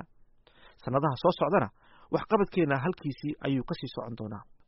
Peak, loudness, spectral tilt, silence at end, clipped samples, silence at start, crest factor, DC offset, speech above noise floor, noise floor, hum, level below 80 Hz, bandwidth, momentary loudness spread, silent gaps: -12 dBFS; -30 LUFS; -6 dB/octave; 0.25 s; under 0.1%; 0 s; 20 dB; under 0.1%; 30 dB; -59 dBFS; none; -58 dBFS; 5.8 kHz; 12 LU; none